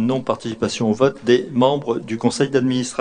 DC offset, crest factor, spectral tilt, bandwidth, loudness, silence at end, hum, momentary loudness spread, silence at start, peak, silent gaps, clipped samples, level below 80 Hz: under 0.1%; 18 dB; -5.5 dB/octave; 10 kHz; -19 LUFS; 0 s; none; 7 LU; 0 s; -2 dBFS; none; under 0.1%; -54 dBFS